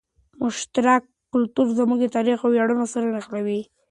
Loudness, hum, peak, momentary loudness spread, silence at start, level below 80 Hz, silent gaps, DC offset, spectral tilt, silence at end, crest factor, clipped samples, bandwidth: -22 LUFS; none; -6 dBFS; 8 LU; 0.4 s; -66 dBFS; none; under 0.1%; -5 dB/octave; 0.25 s; 16 dB; under 0.1%; 10.5 kHz